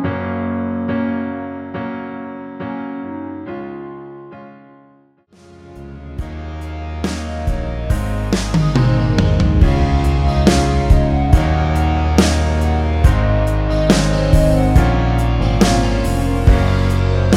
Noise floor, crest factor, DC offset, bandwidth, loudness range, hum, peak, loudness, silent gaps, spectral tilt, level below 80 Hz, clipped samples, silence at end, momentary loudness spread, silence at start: -51 dBFS; 16 dB; under 0.1%; 14.5 kHz; 16 LU; none; 0 dBFS; -16 LUFS; none; -6.5 dB/octave; -20 dBFS; under 0.1%; 0 s; 15 LU; 0 s